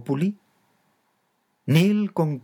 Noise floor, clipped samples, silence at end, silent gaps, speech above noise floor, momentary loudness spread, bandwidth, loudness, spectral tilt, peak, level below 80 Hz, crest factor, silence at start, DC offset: -71 dBFS; under 0.1%; 0.05 s; none; 49 dB; 17 LU; 18.5 kHz; -22 LUFS; -7.5 dB/octave; -6 dBFS; -78 dBFS; 18 dB; 0 s; under 0.1%